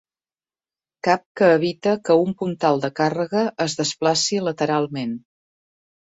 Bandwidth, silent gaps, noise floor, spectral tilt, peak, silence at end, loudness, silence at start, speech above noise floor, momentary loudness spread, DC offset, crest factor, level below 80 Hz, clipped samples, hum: 8 kHz; 1.26-1.35 s; under -90 dBFS; -4.5 dB/octave; -2 dBFS; 0.95 s; -21 LUFS; 1.05 s; over 70 dB; 8 LU; under 0.1%; 20 dB; -64 dBFS; under 0.1%; none